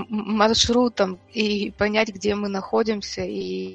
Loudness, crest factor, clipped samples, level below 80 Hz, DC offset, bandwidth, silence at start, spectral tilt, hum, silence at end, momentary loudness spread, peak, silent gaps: -22 LUFS; 20 dB; under 0.1%; -48 dBFS; under 0.1%; 8.6 kHz; 0 s; -4 dB/octave; none; 0 s; 10 LU; -2 dBFS; none